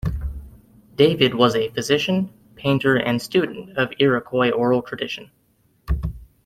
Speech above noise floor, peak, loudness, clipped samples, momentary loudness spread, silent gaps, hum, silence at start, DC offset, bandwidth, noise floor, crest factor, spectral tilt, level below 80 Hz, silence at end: 42 dB; -2 dBFS; -21 LUFS; under 0.1%; 14 LU; none; none; 0.05 s; under 0.1%; 15.5 kHz; -62 dBFS; 20 dB; -5.5 dB/octave; -36 dBFS; 0.2 s